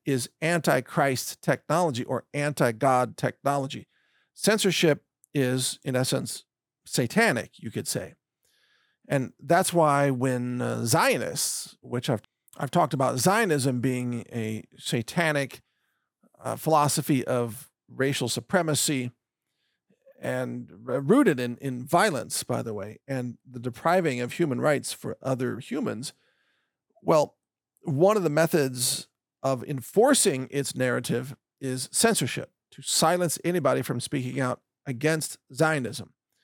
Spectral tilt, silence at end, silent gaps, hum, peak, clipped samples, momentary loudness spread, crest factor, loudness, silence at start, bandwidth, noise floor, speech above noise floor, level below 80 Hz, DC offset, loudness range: -4.5 dB/octave; 0.4 s; none; none; -8 dBFS; under 0.1%; 13 LU; 18 dB; -26 LUFS; 0.05 s; over 20 kHz; -80 dBFS; 54 dB; -72 dBFS; under 0.1%; 4 LU